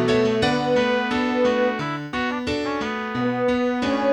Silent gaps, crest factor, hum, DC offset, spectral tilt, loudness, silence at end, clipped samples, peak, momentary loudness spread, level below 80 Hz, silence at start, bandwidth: none; 14 dB; none; 0.1%; -5.5 dB/octave; -22 LUFS; 0 s; under 0.1%; -8 dBFS; 6 LU; -50 dBFS; 0 s; 10.5 kHz